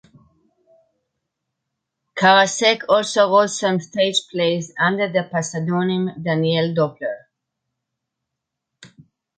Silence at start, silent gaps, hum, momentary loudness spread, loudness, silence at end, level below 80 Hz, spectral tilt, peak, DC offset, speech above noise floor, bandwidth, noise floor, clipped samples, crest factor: 2.15 s; none; none; 9 LU; -18 LUFS; 0.5 s; -68 dBFS; -4 dB/octave; -4 dBFS; under 0.1%; 63 dB; 9.4 kHz; -81 dBFS; under 0.1%; 18 dB